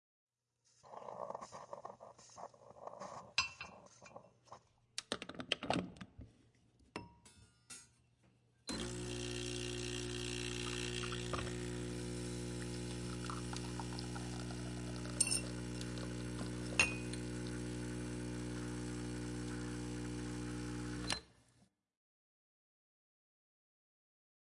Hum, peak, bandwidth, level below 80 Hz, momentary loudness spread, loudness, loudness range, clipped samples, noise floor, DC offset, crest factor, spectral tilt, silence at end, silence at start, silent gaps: none; -14 dBFS; 11.5 kHz; -56 dBFS; 17 LU; -42 LUFS; 9 LU; under 0.1%; -78 dBFS; under 0.1%; 30 dB; -3.5 dB/octave; 2.9 s; 0.85 s; none